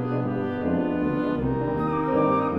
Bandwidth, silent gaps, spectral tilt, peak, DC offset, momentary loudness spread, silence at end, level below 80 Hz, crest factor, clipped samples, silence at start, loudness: 5.4 kHz; none; -10 dB/octave; -10 dBFS; under 0.1%; 5 LU; 0 s; -46 dBFS; 14 dB; under 0.1%; 0 s; -25 LUFS